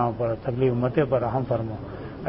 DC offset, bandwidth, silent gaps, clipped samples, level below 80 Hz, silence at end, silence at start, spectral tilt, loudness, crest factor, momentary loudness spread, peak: 0.1%; 5.6 kHz; none; under 0.1%; -48 dBFS; 0 s; 0 s; -12.5 dB/octave; -25 LUFS; 16 dB; 11 LU; -8 dBFS